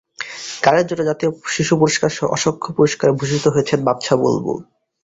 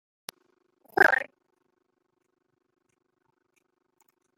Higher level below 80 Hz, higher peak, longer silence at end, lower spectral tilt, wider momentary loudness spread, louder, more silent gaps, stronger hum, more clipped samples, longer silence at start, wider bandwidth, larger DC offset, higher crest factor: first, -52 dBFS vs -80 dBFS; first, 0 dBFS vs -6 dBFS; second, 0.4 s vs 3.15 s; first, -5 dB/octave vs -3 dB/octave; second, 9 LU vs 24 LU; first, -17 LUFS vs -23 LUFS; neither; neither; neither; second, 0.2 s vs 0.95 s; second, 8 kHz vs 16 kHz; neither; second, 18 dB vs 28 dB